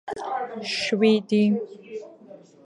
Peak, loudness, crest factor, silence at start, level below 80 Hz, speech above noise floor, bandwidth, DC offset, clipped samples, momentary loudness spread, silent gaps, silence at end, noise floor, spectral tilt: -6 dBFS; -23 LUFS; 18 dB; 0.05 s; -70 dBFS; 26 dB; 11 kHz; under 0.1%; under 0.1%; 19 LU; none; 0.3 s; -48 dBFS; -5.5 dB/octave